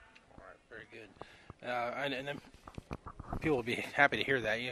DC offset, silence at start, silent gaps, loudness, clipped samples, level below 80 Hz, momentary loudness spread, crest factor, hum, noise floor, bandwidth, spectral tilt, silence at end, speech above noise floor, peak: under 0.1%; 0 s; none; -34 LUFS; under 0.1%; -56 dBFS; 24 LU; 26 dB; none; -57 dBFS; 13 kHz; -5 dB/octave; 0 s; 22 dB; -10 dBFS